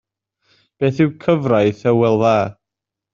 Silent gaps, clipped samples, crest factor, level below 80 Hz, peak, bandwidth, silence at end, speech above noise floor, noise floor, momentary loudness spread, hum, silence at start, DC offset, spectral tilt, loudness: none; under 0.1%; 16 dB; -56 dBFS; -2 dBFS; 7.4 kHz; 0.6 s; 69 dB; -84 dBFS; 6 LU; none; 0.8 s; under 0.1%; -6.5 dB/octave; -17 LUFS